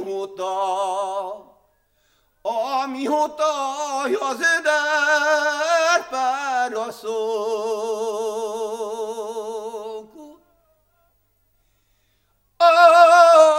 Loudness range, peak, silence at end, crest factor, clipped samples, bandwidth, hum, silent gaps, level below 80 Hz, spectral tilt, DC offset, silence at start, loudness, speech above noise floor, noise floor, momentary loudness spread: 12 LU; 0 dBFS; 0 s; 20 dB; under 0.1%; 16 kHz; none; none; -66 dBFS; -1 dB/octave; under 0.1%; 0 s; -19 LUFS; 43 dB; -66 dBFS; 18 LU